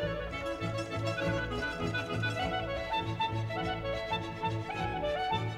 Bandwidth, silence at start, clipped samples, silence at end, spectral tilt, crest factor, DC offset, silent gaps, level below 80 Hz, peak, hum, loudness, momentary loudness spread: 13 kHz; 0 s; under 0.1%; 0 s; -5.5 dB/octave; 16 dB; under 0.1%; none; -48 dBFS; -18 dBFS; none; -34 LUFS; 3 LU